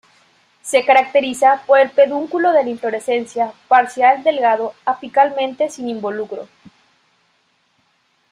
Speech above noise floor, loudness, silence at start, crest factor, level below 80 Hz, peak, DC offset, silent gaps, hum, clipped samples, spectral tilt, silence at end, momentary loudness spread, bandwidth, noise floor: 46 dB; -16 LUFS; 0.65 s; 16 dB; -68 dBFS; -2 dBFS; under 0.1%; none; none; under 0.1%; -3 dB/octave; 1.85 s; 11 LU; 13 kHz; -62 dBFS